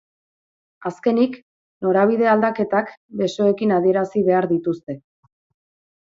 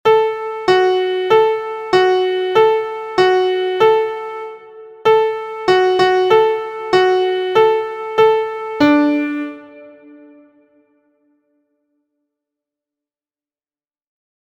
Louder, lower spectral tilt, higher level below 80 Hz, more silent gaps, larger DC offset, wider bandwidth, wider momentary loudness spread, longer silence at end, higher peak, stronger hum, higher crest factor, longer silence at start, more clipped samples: second, -19 LUFS vs -15 LUFS; first, -7.5 dB/octave vs -5 dB/octave; second, -64 dBFS vs -58 dBFS; first, 1.42-1.81 s, 2.97-3.09 s vs none; neither; second, 7.6 kHz vs 15 kHz; first, 14 LU vs 9 LU; second, 1.15 s vs 4.5 s; second, -6 dBFS vs 0 dBFS; neither; about the same, 16 dB vs 16 dB; first, 0.8 s vs 0.05 s; neither